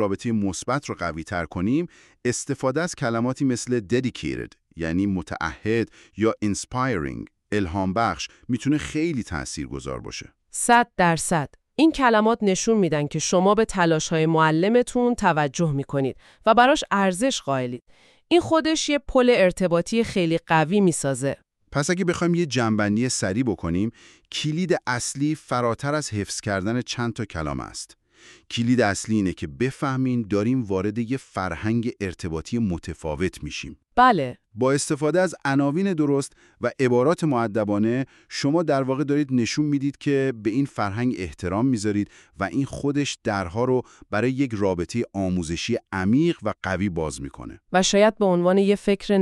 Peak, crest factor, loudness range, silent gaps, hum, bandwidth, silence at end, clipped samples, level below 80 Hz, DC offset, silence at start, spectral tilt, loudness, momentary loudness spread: -4 dBFS; 20 dB; 5 LU; none; none; 13 kHz; 0 s; under 0.1%; -48 dBFS; under 0.1%; 0 s; -5 dB/octave; -23 LUFS; 11 LU